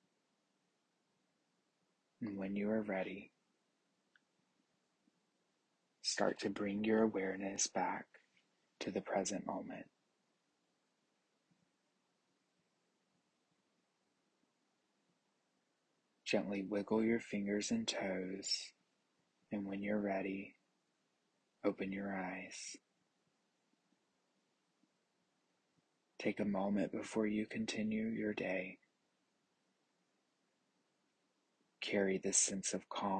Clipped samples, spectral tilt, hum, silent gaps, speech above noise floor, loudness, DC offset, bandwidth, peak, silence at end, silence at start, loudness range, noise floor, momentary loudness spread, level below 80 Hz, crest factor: under 0.1%; -3.5 dB/octave; none; none; 44 dB; -39 LUFS; under 0.1%; 9.4 kHz; -20 dBFS; 0 s; 2.2 s; 10 LU; -83 dBFS; 12 LU; -80 dBFS; 24 dB